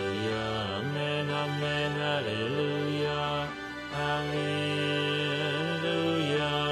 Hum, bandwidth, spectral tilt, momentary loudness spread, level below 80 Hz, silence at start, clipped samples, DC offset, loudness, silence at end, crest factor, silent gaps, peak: none; 13.5 kHz; -5.5 dB/octave; 4 LU; -58 dBFS; 0 s; under 0.1%; under 0.1%; -30 LUFS; 0 s; 14 dB; none; -16 dBFS